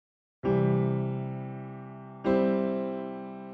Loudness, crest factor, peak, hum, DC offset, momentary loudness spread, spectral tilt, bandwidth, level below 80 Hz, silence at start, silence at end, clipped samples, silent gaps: -29 LUFS; 18 dB; -12 dBFS; none; under 0.1%; 15 LU; -8.5 dB/octave; 4.9 kHz; -60 dBFS; 0.45 s; 0 s; under 0.1%; none